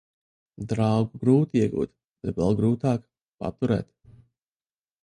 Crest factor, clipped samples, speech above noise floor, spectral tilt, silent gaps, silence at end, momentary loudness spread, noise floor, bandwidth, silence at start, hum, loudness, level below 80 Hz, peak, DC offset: 18 dB; under 0.1%; over 66 dB; -8.5 dB/octave; 2.04-2.08 s; 1.2 s; 14 LU; under -90 dBFS; 11 kHz; 0.6 s; none; -25 LUFS; -52 dBFS; -8 dBFS; under 0.1%